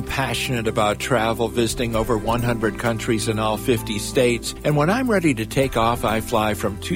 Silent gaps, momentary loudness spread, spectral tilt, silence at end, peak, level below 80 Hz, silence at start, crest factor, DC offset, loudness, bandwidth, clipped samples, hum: none; 4 LU; -5 dB/octave; 0 s; -4 dBFS; -36 dBFS; 0 s; 16 dB; under 0.1%; -21 LUFS; 16.5 kHz; under 0.1%; none